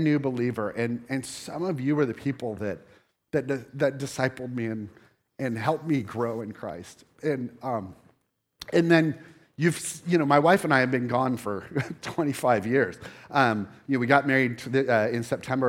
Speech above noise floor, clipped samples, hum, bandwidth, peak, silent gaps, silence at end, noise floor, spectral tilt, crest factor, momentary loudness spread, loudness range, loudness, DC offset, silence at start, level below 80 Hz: 46 dB; under 0.1%; none; 16.5 kHz; -4 dBFS; none; 0 s; -71 dBFS; -6 dB/octave; 22 dB; 13 LU; 7 LU; -26 LUFS; under 0.1%; 0 s; -68 dBFS